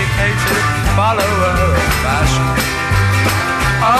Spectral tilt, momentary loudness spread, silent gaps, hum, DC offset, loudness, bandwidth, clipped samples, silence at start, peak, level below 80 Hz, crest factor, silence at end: -4.5 dB/octave; 2 LU; none; none; under 0.1%; -14 LUFS; 15.5 kHz; under 0.1%; 0 s; -2 dBFS; -24 dBFS; 12 dB; 0 s